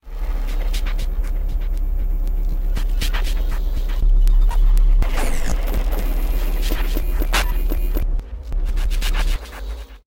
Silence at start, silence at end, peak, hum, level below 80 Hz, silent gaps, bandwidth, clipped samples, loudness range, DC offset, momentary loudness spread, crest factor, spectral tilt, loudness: 0.05 s; 0.15 s; -6 dBFS; none; -18 dBFS; none; 16.5 kHz; under 0.1%; 3 LU; under 0.1%; 8 LU; 10 dB; -4.5 dB/octave; -24 LUFS